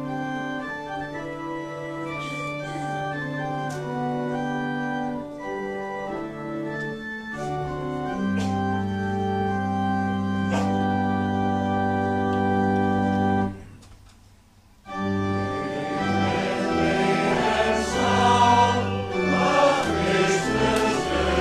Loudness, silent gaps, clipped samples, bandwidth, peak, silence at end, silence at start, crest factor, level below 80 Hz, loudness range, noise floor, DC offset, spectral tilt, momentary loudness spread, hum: -24 LUFS; none; under 0.1%; 13 kHz; -6 dBFS; 0 s; 0 s; 18 dB; -46 dBFS; 10 LU; -54 dBFS; under 0.1%; -5.5 dB/octave; 11 LU; none